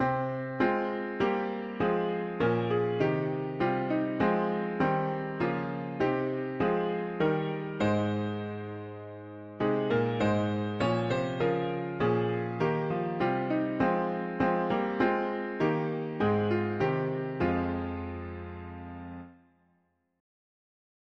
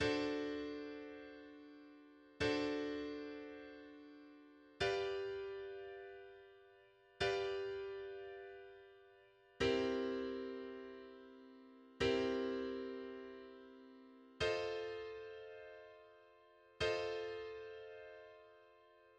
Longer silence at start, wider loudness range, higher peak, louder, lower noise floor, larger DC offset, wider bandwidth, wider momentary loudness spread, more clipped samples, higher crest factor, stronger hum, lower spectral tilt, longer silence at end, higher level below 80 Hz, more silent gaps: about the same, 0 s vs 0 s; about the same, 3 LU vs 4 LU; first, -12 dBFS vs -24 dBFS; first, -30 LUFS vs -43 LUFS; first, -73 dBFS vs -67 dBFS; neither; second, 7.8 kHz vs 9.8 kHz; second, 11 LU vs 23 LU; neither; about the same, 18 dB vs 20 dB; neither; first, -8 dB/octave vs -5 dB/octave; first, 1.85 s vs 0.05 s; first, -58 dBFS vs -68 dBFS; neither